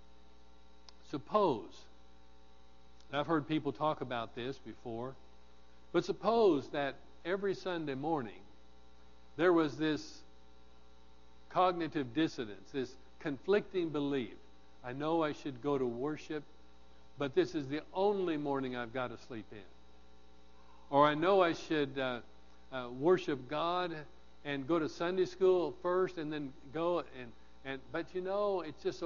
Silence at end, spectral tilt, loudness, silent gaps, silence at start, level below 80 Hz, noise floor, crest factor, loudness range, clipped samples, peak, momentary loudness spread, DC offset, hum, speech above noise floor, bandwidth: 0 s; -4.5 dB/octave; -35 LUFS; none; 1.1 s; -66 dBFS; -63 dBFS; 22 dB; 5 LU; under 0.1%; -14 dBFS; 15 LU; 0.2%; none; 28 dB; 7.2 kHz